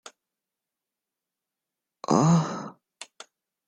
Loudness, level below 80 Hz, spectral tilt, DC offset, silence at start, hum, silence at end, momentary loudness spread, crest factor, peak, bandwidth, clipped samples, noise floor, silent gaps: -23 LUFS; -66 dBFS; -6.5 dB/octave; under 0.1%; 2.1 s; none; 0.65 s; 24 LU; 22 dB; -8 dBFS; 10.5 kHz; under 0.1%; -88 dBFS; none